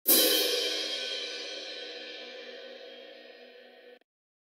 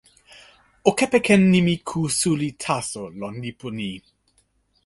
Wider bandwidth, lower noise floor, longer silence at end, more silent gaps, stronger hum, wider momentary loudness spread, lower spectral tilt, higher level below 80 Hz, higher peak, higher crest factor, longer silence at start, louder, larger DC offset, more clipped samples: first, 16.5 kHz vs 11.5 kHz; second, -53 dBFS vs -65 dBFS; second, 0.55 s vs 0.85 s; neither; neither; first, 26 LU vs 16 LU; second, 1 dB/octave vs -5 dB/octave; second, -90 dBFS vs -56 dBFS; second, -8 dBFS vs -2 dBFS; about the same, 24 dB vs 20 dB; second, 0.05 s vs 0.85 s; second, -28 LUFS vs -22 LUFS; neither; neither